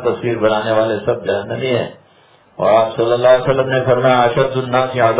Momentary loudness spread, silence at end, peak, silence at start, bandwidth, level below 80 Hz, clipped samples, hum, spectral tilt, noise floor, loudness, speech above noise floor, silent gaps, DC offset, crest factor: 7 LU; 0 s; 0 dBFS; 0 s; 4 kHz; -50 dBFS; under 0.1%; none; -10 dB/octave; -50 dBFS; -15 LUFS; 35 dB; none; under 0.1%; 14 dB